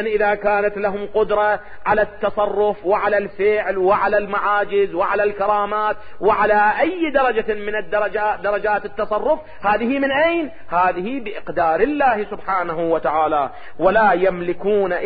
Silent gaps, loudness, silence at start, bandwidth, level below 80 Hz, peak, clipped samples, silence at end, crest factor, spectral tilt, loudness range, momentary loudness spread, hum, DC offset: none; -19 LUFS; 0 s; 5 kHz; -48 dBFS; -4 dBFS; under 0.1%; 0 s; 16 dB; -10 dB/octave; 2 LU; 7 LU; none; 1%